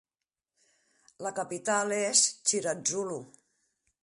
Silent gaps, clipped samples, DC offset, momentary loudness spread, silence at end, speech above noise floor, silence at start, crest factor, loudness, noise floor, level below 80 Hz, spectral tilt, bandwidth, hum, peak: none; under 0.1%; under 0.1%; 14 LU; 0.75 s; over 60 dB; 1.2 s; 24 dB; -28 LUFS; under -90 dBFS; -80 dBFS; -1 dB/octave; 11.5 kHz; none; -8 dBFS